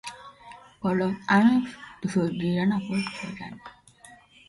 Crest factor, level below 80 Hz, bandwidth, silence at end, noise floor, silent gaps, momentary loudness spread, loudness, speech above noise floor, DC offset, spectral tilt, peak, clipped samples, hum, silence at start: 18 dB; -60 dBFS; 11.5 kHz; 0.8 s; -52 dBFS; none; 21 LU; -25 LUFS; 28 dB; under 0.1%; -6.5 dB/octave; -8 dBFS; under 0.1%; none; 0.05 s